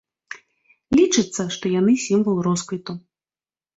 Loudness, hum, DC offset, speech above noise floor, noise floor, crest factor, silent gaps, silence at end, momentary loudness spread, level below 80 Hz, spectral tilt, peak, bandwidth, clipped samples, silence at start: -20 LUFS; none; under 0.1%; over 71 dB; under -90 dBFS; 16 dB; none; 0.8 s; 22 LU; -56 dBFS; -5 dB/octave; -6 dBFS; 8.2 kHz; under 0.1%; 0.3 s